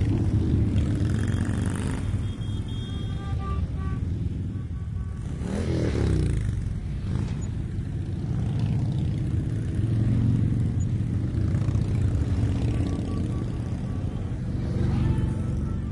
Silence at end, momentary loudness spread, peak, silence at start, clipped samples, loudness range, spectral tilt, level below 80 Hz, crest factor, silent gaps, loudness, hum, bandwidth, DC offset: 0 s; 7 LU; -10 dBFS; 0 s; under 0.1%; 4 LU; -8 dB/octave; -34 dBFS; 14 dB; none; -27 LUFS; none; 11.5 kHz; under 0.1%